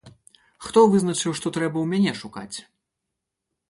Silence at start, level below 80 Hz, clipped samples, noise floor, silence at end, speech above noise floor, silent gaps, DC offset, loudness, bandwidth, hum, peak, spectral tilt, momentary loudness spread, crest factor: 0.05 s; -62 dBFS; under 0.1%; -82 dBFS; 1.1 s; 61 dB; none; under 0.1%; -21 LUFS; 11.5 kHz; none; -4 dBFS; -5 dB/octave; 19 LU; 20 dB